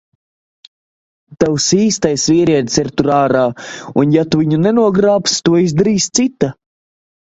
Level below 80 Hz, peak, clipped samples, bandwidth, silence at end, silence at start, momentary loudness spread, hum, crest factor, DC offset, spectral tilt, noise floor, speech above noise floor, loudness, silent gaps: -48 dBFS; 0 dBFS; under 0.1%; 8.2 kHz; 0.85 s; 1.3 s; 6 LU; none; 14 dB; under 0.1%; -5 dB/octave; under -90 dBFS; over 77 dB; -13 LUFS; none